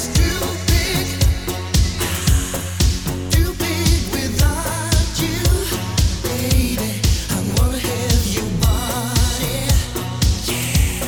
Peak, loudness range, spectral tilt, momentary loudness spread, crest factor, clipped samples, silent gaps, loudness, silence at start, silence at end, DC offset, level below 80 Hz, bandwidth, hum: -2 dBFS; 1 LU; -4 dB/octave; 3 LU; 14 dB; under 0.1%; none; -19 LUFS; 0 s; 0 s; 0.5%; -22 dBFS; 19 kHz; none